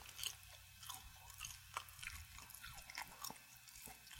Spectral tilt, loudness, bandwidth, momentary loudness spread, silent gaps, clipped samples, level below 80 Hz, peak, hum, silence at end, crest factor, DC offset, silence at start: -0.5 dB/octave; -52 LUFS; 17 kHz; 9 LU; none; under 0.1%; -68 dBFS; -24 dBFS; none; 0 s; 30 dB; under 0.1%; 0 s